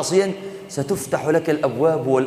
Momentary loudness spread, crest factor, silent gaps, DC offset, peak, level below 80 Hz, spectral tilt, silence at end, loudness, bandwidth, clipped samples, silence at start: 10 LU; 16 dB; none; under 0.1%; -4 dBFS; -60 dBFS; -5.5 dB/octave; 0 s; -21 LUFS; 15.5 kHz; under 0.1%; 0 s